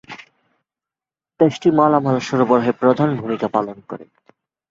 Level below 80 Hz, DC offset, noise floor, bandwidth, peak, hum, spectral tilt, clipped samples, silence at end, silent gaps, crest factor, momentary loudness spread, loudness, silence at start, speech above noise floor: -60 dBFS; under 0.1%; -90 dBFS; 7.6 kHz; -2 dBFS; none; -7.5 dB/octave; under 0.1%; 0.65 s; none; 18 dB; 20 LU; -17 LUFS; 0.1 s; 73 dB